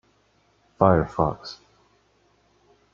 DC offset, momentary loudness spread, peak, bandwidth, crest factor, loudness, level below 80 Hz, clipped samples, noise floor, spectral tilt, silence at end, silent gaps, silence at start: under 0.1%; 21 LU; -2 dBFS; 7.2 kHz; 24 dB; -22 LUFS; -48 dBFS; under 0.1%; -64 dBFS; -8 dB/octave; 1.4 s; none; 0.8 s